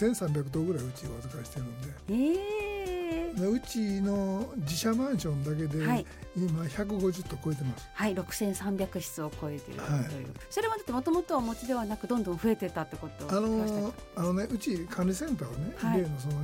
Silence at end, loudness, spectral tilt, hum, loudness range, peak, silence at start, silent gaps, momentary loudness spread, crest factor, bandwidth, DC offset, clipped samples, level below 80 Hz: 0 s; -32 LUFS; -6 dB/octave; none; 2 LU; -16 dBFS; 0 s; none; 9 LU; 16 dB; 17 kHz; under 0.1%; under 0.1%; -50 dBFS